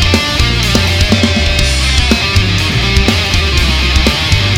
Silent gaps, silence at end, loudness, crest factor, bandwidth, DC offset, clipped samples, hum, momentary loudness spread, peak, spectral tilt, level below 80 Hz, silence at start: none; 0 s; -10 LUFS; 10 dB; 17 kHz; under 0.1%; under 0.1%; none; 1 LU; 0 dBFS; -4 dB/octave; -16 dBFS; 0 s